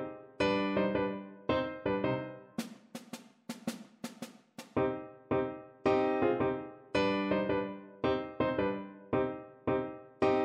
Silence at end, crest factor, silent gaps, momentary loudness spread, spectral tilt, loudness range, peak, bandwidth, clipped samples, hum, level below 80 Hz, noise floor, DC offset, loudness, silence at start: 0 s; 18 dB; none; 15 LU; -6.5 dB/octave; 7 LU; -16 dBFS; 15.5 kHz; under 0.1%; none; -60 dBFS; -53 dBFS; under 0.1%; -34 LUFS; 0 s